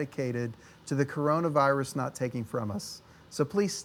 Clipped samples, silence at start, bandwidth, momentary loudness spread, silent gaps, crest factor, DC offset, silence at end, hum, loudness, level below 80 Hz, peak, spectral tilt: under 0.1%; 0 s; 18.5 kHz; 15 LU; none; 20 dB; under 0.1%; 0 s; none; -30 LUFS; -66 dBFS; -10 dBFS; -6 dB/octave